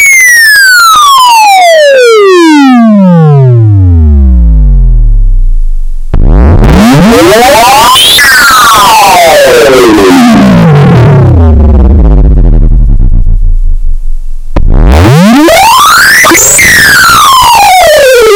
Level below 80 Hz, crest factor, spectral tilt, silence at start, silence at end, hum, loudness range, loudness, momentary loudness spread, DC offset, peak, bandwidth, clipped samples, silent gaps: -8 dBFS; 2 dB; -4 dB/octave; 0 s; 0 s; none; 6 LU; -1 LUFS; 12 LU; under 0.1%; 0 dBFS; over 20 kHz; 40%; none